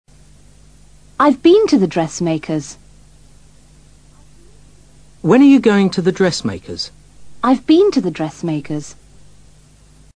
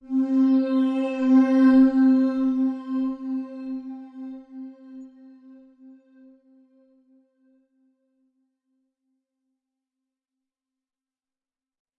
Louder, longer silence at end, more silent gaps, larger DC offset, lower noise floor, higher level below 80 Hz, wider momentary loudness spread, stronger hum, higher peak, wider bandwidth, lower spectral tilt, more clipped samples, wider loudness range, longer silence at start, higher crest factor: first, -15 LUFS vs -21 LUFS; second, 1.25 s vs 6.9 s; neither; first, 0.3% vs under 0.1%; second, -47 dBFS vs under -90 dBFS; first, -48 dBFS vs -64 dBFS; second, 16 LU vs 24 LU; neither; first, 0 dBFS vs -8 dBFS; first, 10 kHz vs 5.6 kHz; about the same, -6 dB/octave vs -7 dB/octave; neither; second, 8 LU vs 23 LU; first, 1.2 s vs 0.05 s; about the same, 16 dB vs 16 dB